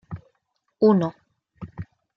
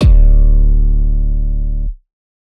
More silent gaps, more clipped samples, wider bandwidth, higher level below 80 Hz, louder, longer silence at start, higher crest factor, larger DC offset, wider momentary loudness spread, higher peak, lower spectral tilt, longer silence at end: neither; neither; first, 6.2 kHz vs 3.7 kHz; second, -58 dBFS vs -10 dBFS; second, -21 LUFS vs -16 LUFS; about the same, 0.1 s vs 0 s; first, 20 dB vs 10 dB; neither; first, 22 LU vs 11 LU; second, -6 dBFS vs 0 dBFS; about the same, -10 dB/octave vs -9 dB/octave; second, 0.35 s vs 0.5 s